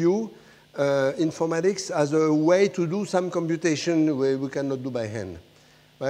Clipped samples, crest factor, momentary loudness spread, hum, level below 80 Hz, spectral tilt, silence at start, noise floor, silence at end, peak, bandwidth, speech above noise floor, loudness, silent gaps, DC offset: under 0.1%; 16 dB; 11 LU; none; -66 dBFS; -6 dB/octave; 0 s; -55 dBFS; 0 s; -8 dBFS; 11.5 kHz; 32 dB; -24 LUFS; none; under 0.1%